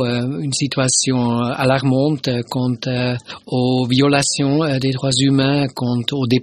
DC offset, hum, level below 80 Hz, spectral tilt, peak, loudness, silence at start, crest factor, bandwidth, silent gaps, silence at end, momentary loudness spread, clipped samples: under 0.1%; none; -52 dBFS; -4.5 dB/octave; 0 dBFS; -17 LUFS; 0 s; 18 dB; 13 kHz; none; 0 s; 6 LU; under 0.1%